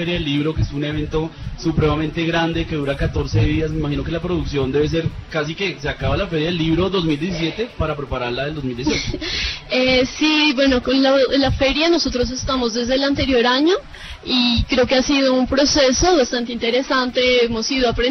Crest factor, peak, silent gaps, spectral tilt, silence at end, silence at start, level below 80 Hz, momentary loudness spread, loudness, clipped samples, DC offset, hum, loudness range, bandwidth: 14 dB; -4 dBFS; none; -4.5 dB/octave; 0 s; 0 s; -32 dBFS; 8 LU; -18 LUFS; under 0.1%; under 0.1%; none; 5 LU; 6.4 kHz